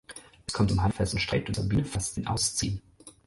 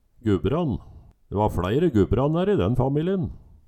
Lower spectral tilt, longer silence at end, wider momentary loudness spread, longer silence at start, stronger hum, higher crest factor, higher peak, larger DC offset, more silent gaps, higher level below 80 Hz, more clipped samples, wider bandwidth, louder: second, -4.5 dB/octave vs -9 dB/octave; second, 0.15 s vs 0.3 s; first, 11 LU vs 8 LU; second, 0.1 s vs 0.25 s; neither; about the same, 16 dB vs 16 dB; second, -14 dBFS vs -8 dBFS; neither; neither; about the same, -42 dBFS vs -38 dBFS; neither; second, 11.5 kHz vs 14 kHz; second, -28 LUFS vs -24 LUFS